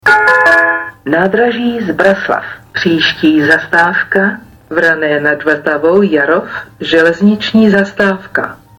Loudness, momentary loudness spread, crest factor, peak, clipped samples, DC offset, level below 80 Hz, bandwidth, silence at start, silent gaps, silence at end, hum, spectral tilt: -11 LUFS; 10 LU; 10 dB; 0 dBFS; under 0.1%; under 0.1%; -48 dBFS; 17 kHz; 0.05 s; none; 0.25 s; none; -6 dB/octave